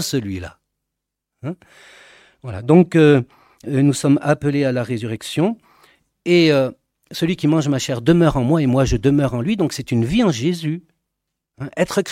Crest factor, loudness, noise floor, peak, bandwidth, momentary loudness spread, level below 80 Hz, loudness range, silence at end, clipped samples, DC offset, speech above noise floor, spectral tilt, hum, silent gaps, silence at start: 18 dB; -17 LUFS; -81 dBFS; 0 dBFS; 16 kHz; 18 LU; -40 dBFS; 3 LU; 0 s; under 0.1%; under 0.1%; 63 dB; -6.5 dB/octave; none; none; 0 s